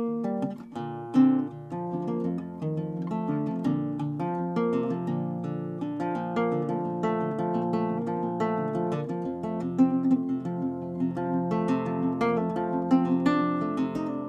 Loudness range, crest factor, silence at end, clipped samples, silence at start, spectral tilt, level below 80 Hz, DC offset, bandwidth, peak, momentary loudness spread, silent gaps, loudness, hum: 3 LU; 16 dB; 0 s; under 0.1%; 0 s; -9 dB/octave; -64 dBFS; under 0.1%; 7.8 kHz; -12 dBFS; 8 LU; none; -28 LUFS; none